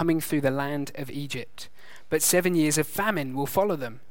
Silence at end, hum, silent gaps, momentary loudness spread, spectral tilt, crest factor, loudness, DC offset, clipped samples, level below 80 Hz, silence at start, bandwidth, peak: 0.15 s; none; none; 13 LU; -4 dB/octave; 18 dB; -26 LUFS; 1%; under 0.1%; -60 dBFS; 0 s; 17 kHz; -8 dBFS